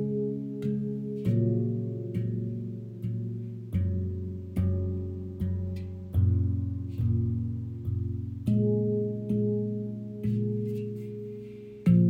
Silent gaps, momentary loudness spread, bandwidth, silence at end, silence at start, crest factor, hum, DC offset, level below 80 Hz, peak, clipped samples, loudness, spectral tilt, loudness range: none; 10 LU; 4.2 kHz; 0 s; 0 s; 18 dB; none; under 0.1%; -50 dBFS; -12 dBFS; under 0.1%; -31 LUFS; -11.5 dB/octave; 3 LU